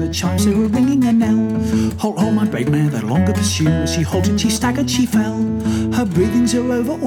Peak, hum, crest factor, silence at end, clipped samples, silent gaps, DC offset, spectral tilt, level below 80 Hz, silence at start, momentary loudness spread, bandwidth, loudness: -4 dBFS; none; 12 dB; 0 s; under 0.1%; none; under 0.1%; -5.5 dB/octave; -36 dBFS; 0 s; 4 LU; 17 kHz; -17 LUFS